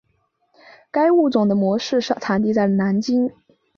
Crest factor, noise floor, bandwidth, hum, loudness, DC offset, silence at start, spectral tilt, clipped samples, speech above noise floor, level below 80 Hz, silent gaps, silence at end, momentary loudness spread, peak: 14 dB; -67 dBFS; 7.2 kHz; none; -19 LUFS; under 0.1%; 0.95 s; -6.5 dB/octave; under 0.1%; 49 dB; -62 dBFS; none; 0.5 s; 5 LU; -6 dBFS